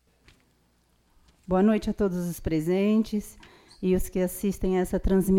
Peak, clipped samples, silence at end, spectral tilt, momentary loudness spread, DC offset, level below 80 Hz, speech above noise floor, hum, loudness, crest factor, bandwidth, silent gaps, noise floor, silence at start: -12 dBFS; under 0.1%; 0 s; -7 dB/octave; 8 LU; under 0.1%; -40 dBFS; 41 dB; none; -26 LUFS; 14 dB; 17 kHz; none; -66 dBFS; 1.5 s